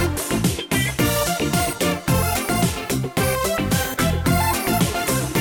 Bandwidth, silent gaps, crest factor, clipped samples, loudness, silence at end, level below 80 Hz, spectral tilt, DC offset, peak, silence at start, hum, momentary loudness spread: over 20 kHz; none; 12 dB; under 0.1%; -20 LUFS; 0 s; -34 dBFS; -4.5 dB/octave; under 0.1%; -8 dBFS; 0 s; none; 2 LU